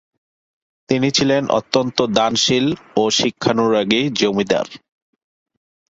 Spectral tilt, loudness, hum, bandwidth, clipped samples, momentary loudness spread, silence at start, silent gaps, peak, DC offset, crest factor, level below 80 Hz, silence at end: -4 dB/octave; -17 LUFS; none; 8 kHz; under 0.1%; 5 LU; 0.9 s; none; 0 dBFS; under 0.1%; 18 dB; -54 dBFS; 1.15 s